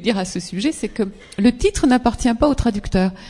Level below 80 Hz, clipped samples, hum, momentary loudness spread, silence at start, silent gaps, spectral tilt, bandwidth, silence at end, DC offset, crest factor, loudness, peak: -32 dBFS; under 0.1%; none; 8 LU; 0 s; none; -5.5 dB/octave; 12 kHz; 0 s; under 0.1%; 18 dB; -19 LUFS; -2 dBFS